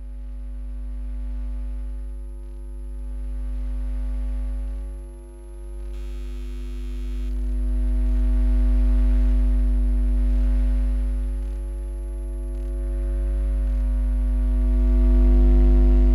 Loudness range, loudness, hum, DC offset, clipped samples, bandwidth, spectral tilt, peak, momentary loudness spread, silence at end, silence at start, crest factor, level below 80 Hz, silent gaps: 11 LU; -25 LUFS; none; under 0.1%; under 0.1%; 2.8 kHz; -9 dB/octave; -10 dBFS; 17 LU; 0 s; 0 s; 12 dB; -22 dBFS; none